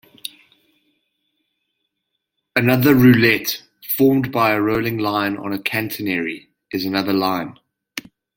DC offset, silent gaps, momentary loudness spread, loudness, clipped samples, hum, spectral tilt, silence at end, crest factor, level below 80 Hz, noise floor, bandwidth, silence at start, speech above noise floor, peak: under 0.1%; none; 21 LU; -18 LUFS; under 0.1%; none; -6 dB/octave; 0.35 s; 20 dB; -54 dBFS; -77 dBFS; 17 kHz; 0.25 s; 60 dB; 0 dBFS